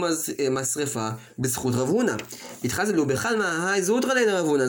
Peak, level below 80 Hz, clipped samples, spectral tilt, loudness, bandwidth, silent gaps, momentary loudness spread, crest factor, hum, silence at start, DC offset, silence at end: -10 dBFS; -58 dBFS; under 0.1%; -4 dB/octave; -24 LUFS; 17 kHz; none; 8 LU; 14 dB; none; 0 s; under 0.1%; 0 s